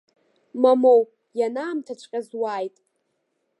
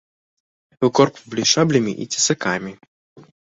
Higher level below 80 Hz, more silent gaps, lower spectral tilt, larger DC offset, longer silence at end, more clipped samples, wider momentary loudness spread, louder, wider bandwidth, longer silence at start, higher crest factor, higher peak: second, -86 dBFS vs -60 dBFS; second, none vs 2.87-3.16 s; first, -5.5 dB/octave vs -3.5 dB/octave; neither; first, 0.9 s vs 0.2 s; neither; first, 15 LU vs 8 LU; second, -22 LUFS vs -19 LUFS; first, 11 kHz vs 8 kHz; second, 0.55 s vs 0.8 s; about the same, 18 dB vs 20 dB; second, -6 dBFS vs -2 dBFS